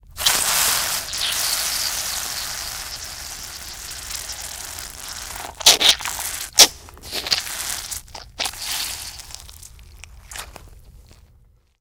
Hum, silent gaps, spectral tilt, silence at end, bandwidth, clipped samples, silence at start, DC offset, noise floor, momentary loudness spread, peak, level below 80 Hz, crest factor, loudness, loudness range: none; none; 1 dB/octave; 0.65 s; 19 kHz; under 0.1%; 0.05 s; under 0.1%; -54 dBFS; 22 LU; 0 dBFS; -46 dBFS; 24 dB; -19 LUFS; 13 LU